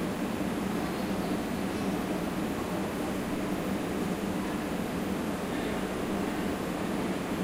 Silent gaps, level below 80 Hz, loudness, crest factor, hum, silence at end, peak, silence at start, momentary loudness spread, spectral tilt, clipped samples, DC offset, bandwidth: none; -50 dBFS; -32 LUFS; 12 dB; none; 0 s; -18 dBFS; 0 s; 1 LU; -5.5 dB/octave; under 0.1%; under 0.1%; 16 kHz